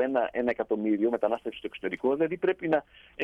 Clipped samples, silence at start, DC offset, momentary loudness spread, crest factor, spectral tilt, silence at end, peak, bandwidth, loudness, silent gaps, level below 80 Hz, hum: under 0.1%; 0 s; under 0.1%; 8 LU; 16 dB; -7.5 dB/octave; 0 s; -14 dBFS; 5.2 kHz; -29 LUFS; none; -64 dBFS; none